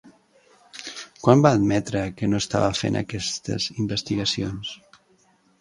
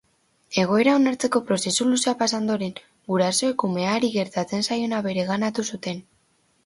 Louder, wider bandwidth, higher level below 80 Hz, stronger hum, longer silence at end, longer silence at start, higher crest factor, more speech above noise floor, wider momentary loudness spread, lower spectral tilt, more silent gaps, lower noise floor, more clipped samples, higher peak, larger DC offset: about the same, -23 LUFS vs -23 LUFS; about the same, 11.5 kHz vs 11.5 kHz; first, -50 dBFS vs -66 dBFS; neither; first, 0.85 s vs 0.65 s; second, 0.05 s vs 0.5 s; first, 24 dB vs 18 dB; about the same, 39 dB vs 42 dB; first, 19 LU vs 9 LU; first, -5.5 dB/octave vs -4 dB/octave; neither; second, -61 dBFS vs -65 dBFS; neither; first, 0 dBFS vs -6 dBFS; neither